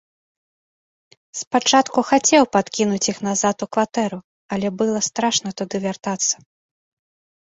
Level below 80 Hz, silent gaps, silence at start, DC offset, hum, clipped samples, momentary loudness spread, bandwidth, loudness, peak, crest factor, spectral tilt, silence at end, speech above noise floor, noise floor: -62 dBFS; 1.47-1.51 s, 4.24-4.49 s; 1.35 s; under 0.1%; none; under 0.1%; 11 LU; 8 kHz; -20 LUFS; -2 dBFS; 20 dB; -3 dB/octave; 1.25 s; over 70 dB; under -90 dBFS